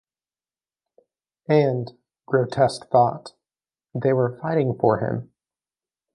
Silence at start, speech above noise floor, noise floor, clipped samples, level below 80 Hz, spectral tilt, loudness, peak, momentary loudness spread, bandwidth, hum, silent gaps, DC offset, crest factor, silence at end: 1.5 s; over 69 dB; under -90 dBFS; under 0.1%; -62 dBFS; -7.5 dB/octave; -22 LUFS; -4 dBFS; 14 LU; 11.5 kHz; none; none; under 0.1%; 20 dB; 0.9 s